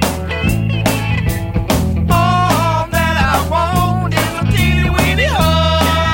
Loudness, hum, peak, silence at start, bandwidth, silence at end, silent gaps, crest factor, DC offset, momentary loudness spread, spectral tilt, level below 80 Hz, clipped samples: -14 LUFS; none; 0 dBFS; 0 s; 17 kHz; 0 s; none; 14 dB; under 0.1%; 4 LU; -5.5 dB/octave; -22 dBFS; under 0.1%